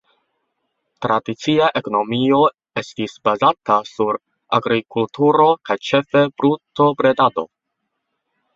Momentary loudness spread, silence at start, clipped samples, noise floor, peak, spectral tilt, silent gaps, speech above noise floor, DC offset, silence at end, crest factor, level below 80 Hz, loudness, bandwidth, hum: 10 LU; 1 s; under 0.1%; -76 dBFS; -2 dBFS; -6 dB/octave; none; 59 dB; under 0.1%; 1.1 s; 18 dB; -60 dBFS; -18 LUFS; 7.6 kHz; none